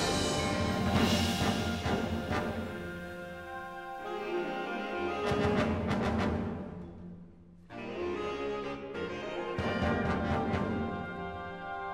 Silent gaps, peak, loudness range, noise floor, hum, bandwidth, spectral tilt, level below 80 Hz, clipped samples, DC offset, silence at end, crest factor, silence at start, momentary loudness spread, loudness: none; -16 dBFS; 5 LU; -53 dBFS; none; 16 kHz; -5 dB/octave; -48 dBFS; under 0.1%; under 0.1%; 0 s; 18 dB; 0 s; 12 LU; -33 LUFS